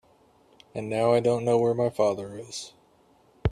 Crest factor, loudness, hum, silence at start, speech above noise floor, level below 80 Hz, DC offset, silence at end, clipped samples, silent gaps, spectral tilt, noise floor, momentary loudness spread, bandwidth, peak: 18 dB; -26 LUFS; none; 0.75 s; 36 dB; -48 dBFS; under 0.1%; 0 s; under 0.1%; none; -6 dB/octave; -61 dBFS; 15 LU; 12.5 kHz; -8 dBFS